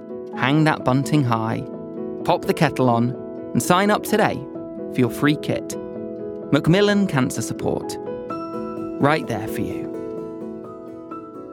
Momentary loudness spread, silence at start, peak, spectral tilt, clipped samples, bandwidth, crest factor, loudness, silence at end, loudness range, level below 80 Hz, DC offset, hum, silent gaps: 14 LU; 0 s; -2 dBFS; -6 dB/octave; under 0.1%; 18.5 kHz; 20 dB; -22 LUFS; 0 s; 5 LU; -54 dBFS; under 0.1%; none; none